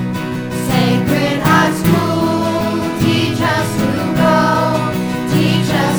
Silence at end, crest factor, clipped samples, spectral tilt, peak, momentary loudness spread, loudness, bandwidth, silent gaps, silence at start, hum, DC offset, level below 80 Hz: 0 s; 14 dB; under 0.1%; -6 dB/octave; 0 dBFS; 6 LU; -15 LUFS; over 20 kHz; none; 0 s; none; under 0.1%; -40 dBFS